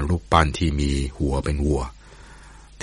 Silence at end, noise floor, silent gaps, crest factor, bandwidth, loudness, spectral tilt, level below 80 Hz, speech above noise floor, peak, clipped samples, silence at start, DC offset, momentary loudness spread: 0 s; -45 dBFS; none; 22 dB; 11.5 kHz; -22 LUFS; -6 dB/octave; -28 dBFS; 23 dB; -2 dBFS; under 0.1%; 0 s; under 0.1%; 6 LU